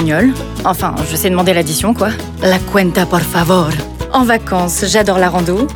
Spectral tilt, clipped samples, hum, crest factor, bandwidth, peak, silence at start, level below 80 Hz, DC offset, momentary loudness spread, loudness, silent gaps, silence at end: -4.5 dB/octave; under 0.1%; none; 12 dB; over 20 kHz; 0 dBFS; 0 s; -30 dBFS; under 0.1%; 5 LU; -13 LUFS; none; 0 s